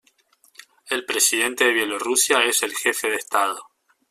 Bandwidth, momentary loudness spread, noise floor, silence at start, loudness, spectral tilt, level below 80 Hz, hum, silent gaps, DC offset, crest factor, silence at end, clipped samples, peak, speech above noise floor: 16 kHz; 9 LU; -60 dBFS; 0.85 s; -20 LUFS; 1 dB/octave; -70 dBFS; none; none; under 0.1%; 20 dB; 0.5 s; under 0.1%; -4 dBFS; 39 dB